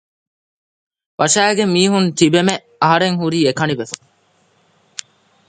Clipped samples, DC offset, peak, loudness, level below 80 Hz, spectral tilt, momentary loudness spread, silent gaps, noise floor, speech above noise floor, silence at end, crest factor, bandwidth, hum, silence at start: under 0.1%; under 0.1%; 0 dBFS; -15 LUFS; -60 dBFS; -4 dB/octave; 19 LU; none; -58 dBFS; 43 dB; 1.55 s; 18 dB; 9.6 kHz; none; 1.2 s